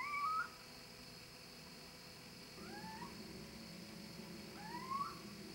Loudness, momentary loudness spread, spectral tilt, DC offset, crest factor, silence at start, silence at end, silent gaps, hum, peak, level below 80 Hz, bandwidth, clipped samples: -48 LUFS; 12 LU; -3.5 dB/octave; under 0.1%; 18 dB; 0 s; 0 s; none; none; -32 dBFS; -72 dBFS; 16.5 kHz; under 0.1%